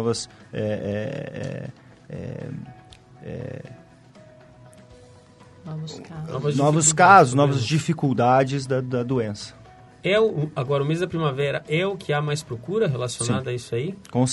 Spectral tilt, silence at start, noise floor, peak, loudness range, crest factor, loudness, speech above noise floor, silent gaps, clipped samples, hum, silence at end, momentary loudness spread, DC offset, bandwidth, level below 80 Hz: -5 dB/octave; 0 s; -49 dBFS; 0 dBFS; 20 LU; 22 dB; -22 LUFS; 27 dB; none; under 0.1%; none; 0 s; 19 LU; under 0.1%; 11.5 kHz; -58 dBFS